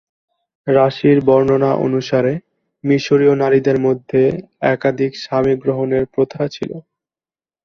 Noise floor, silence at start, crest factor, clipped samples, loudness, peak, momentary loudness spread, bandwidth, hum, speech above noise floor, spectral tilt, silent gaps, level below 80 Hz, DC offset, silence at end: under -90 dBFS; 0.65 s; 16 dB; under 0.1%; -16 LUFS; 0 dBFS; 10 LU; 6.6 kHz; none; over 75 dB; -7.5 dB/octave; none; -52 dBFS; under 0.1%; 0.85 s